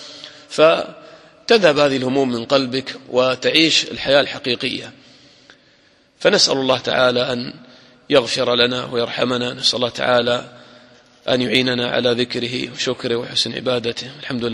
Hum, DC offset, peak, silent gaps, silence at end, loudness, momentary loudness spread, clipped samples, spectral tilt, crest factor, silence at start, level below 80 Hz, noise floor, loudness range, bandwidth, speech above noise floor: none; under 0.1%; 0 dBFS; none; 0 s; -17 LUFS; 11 LU; under 0.1%; -3.5 dB/octave; 20 dB; 0 s; -56 dBFS; -55 dBFS; 3 LU; 12 kHz; 37 dB